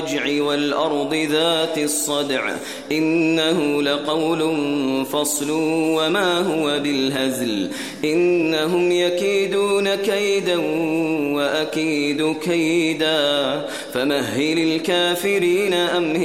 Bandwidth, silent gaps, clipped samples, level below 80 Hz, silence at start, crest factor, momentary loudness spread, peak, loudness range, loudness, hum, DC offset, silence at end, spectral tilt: 16 kHz; none; under 0.1%; -62 dBFS; 0 s; 14 dB; 4 LU; -6 dBFS; 1 LU; -20 LUFS; none; 0.2%; 0 s; -3.5 dB/octave